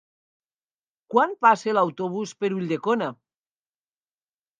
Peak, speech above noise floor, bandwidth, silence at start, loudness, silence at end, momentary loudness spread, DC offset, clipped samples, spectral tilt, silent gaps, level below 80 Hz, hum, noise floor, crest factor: -4 dBFS; over 67 dB; 9.6 kHz; 1.1 s; -23 LUFS; 1.45 s; 10 LU; under 0.1%; under 0.1%; -6 dB/octave; none; -80 dBFS; none; under -90 dBFS; 22 dB